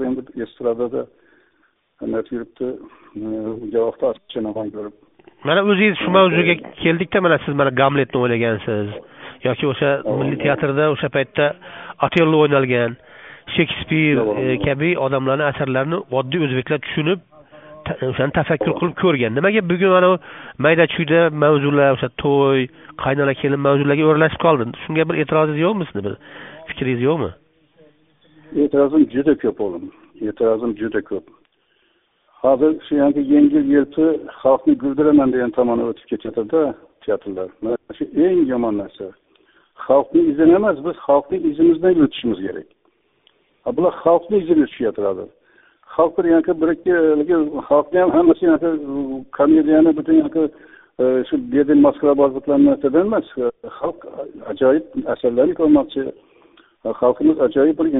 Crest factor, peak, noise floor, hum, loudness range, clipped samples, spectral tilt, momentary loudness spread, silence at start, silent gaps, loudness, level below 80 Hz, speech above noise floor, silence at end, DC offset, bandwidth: 18 dB; 0 dBFS; -62 dBFS; none; 5 LU; under 0.1%; -5.5 dB/octave; 14 LU; 0 s; none; -18 LUFS; -52 dBFS; 45 dB; 0 s; under 0.1%; 3.9 kHz